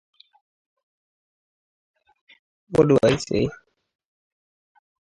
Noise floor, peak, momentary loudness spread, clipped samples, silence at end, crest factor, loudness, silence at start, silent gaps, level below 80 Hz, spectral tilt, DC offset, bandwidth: under -90 dBFS; -4 dBFS; 8 LU; under 0.1%; 1.5 s; 24 dB; -20 LUFS; 2.7 s; none; -52 dBFS; -6.5 dB/octave; under 0.1%; 11.5 kHz